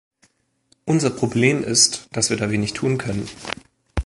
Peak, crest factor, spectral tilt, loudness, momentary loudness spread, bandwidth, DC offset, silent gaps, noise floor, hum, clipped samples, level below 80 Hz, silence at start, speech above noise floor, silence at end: -2 dBFS; 20 dB; -3.5 dB/octave; -20 LUFS; 16 LU; 11.5 kHz; under 0.1%; none; -63 dBFS; none; under 0.1%; -40 dBFS; 0.85 s; 42 dB; 0 s